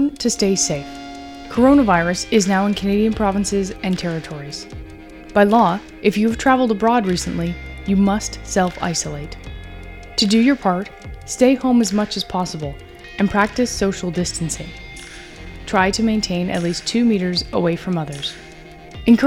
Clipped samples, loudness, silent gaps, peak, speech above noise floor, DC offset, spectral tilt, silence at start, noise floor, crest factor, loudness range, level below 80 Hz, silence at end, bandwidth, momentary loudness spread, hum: under 0.1%; -18 LUFS; none; 0 dBFS; 21 dB; under 0.1%; -4.5 dB/octave; 0 s; -39 dBFS; 18 dB; 4 LU; -38 dBFS; 0 s; 15.5 kHz; 20 LU; none